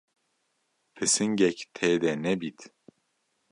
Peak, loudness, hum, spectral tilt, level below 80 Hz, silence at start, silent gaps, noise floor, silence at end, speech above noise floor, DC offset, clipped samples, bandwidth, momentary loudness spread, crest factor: -8 dBFS; -26 LUFS; none; -3.5 dB/octave; -68 dBFS; 0.95 s; none; -75 dBFS; 0.85 s; 49 dB; under 0.1%; under 0.1%; 11.5 kHz; 7 LU; 22 dB